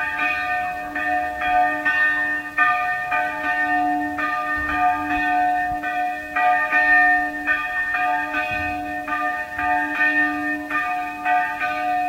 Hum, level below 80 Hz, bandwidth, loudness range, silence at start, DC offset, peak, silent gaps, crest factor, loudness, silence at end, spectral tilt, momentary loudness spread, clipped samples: none; -48 dBFS; 16 kHz; 3 LU; 0 s; under 0.1%; -6 dBFS; none; 16 dB; -20 LUFS; 0 s; -4.5 dB/octave; 7 LU; under 0.1%